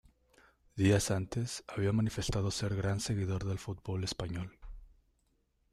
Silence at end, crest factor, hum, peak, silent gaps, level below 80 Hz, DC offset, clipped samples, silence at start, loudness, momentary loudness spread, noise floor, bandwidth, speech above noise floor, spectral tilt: 0.85 s; 18 dB; none; -16 dBFS; none; -52 dBFS; under 0.1%; under 0.1%; 0.75 s; -34 LUFS; 11 LU; -75 dBFS; 14 kHz; 42 dB; -5.5 dB/octave